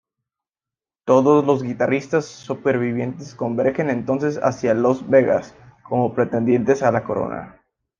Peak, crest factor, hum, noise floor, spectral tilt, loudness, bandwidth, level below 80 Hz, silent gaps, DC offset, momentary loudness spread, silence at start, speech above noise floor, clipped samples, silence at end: -2 dBFS; 18 dB; none; under -90 dBFS; -7.5 dB/octave; -20 LUFS; 7.4 kHz; -58 dBFS; none; under 0.1%; 10 LU; 1.05 s; over 71 dB; under 0.1%; 0.5 s